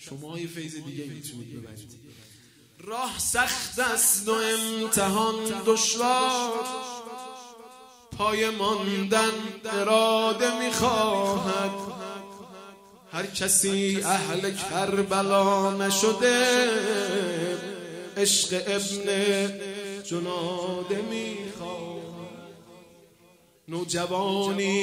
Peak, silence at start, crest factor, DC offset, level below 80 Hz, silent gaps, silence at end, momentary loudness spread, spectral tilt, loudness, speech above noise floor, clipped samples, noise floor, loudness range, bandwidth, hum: -8 dBFS; 0 s; 20 dB; under 0.1%; -62 dBFS; none; 0 s; 18 LU; -2.5 dB/octave; -25 LUFS; 33 dB; under 0.1%; -58 dBFS; 9 LU; 16 kHz; none